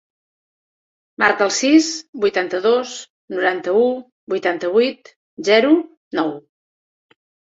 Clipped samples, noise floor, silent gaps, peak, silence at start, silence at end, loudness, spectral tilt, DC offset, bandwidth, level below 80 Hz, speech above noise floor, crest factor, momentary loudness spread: under 0.1%; under -90 dBFS; 2.09-2.13 s, 3.10-3.28 s, 4.12-4.27 s, 5.16-5.37 s, 5.97-6.11 s; -2 dBFS; 1.2 s; 1.15 s; -18 LUFS; -3 dB/octave; under 0.1%; 7.8 kHz; -66 dBFS; over 73 dB; 18 dB; 12 LU